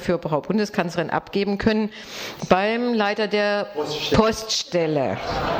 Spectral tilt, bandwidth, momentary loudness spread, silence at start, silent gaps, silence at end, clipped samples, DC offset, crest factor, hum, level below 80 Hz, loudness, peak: -5 dB/octave; 18 kHz; 6 LU; 0 s; none; 0 s; under 0.1%; under 0.1%; 18 dB; none; -44 dBFS; -22 LUFS; -4 dBFS